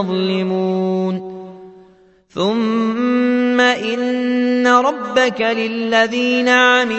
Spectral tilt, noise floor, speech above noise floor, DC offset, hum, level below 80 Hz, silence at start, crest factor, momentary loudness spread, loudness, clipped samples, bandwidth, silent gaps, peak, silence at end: -5 dB/octave; -50 dBFS; 34 dB; under 0.1%; none; -62 dBFS; 0 s; 16 dB; 8 LU; -16 LUFS; under 0.1%; 8.2 kHz; none; 0 dBFS; 0 s